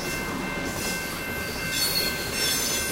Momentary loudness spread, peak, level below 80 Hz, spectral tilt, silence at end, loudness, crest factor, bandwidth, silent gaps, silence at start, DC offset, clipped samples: 7 LU; -14 dBFS; -44 dBFS; -2 dB/octave; 0 s; -26 LUFS; 14 dB; 16 kHz; none; 0 s; under 0.1%; under 0.1%